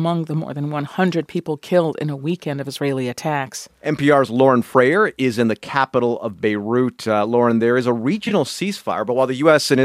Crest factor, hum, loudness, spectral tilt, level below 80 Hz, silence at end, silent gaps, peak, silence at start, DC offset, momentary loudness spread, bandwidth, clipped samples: 18 dB; none; -19 LUFS; -6 dB/octave; -64 dBFS; 0 s; none; 0 dBFS; 0 s; under 0.1%; 10 LU; 15.5 kHz; under 0.1%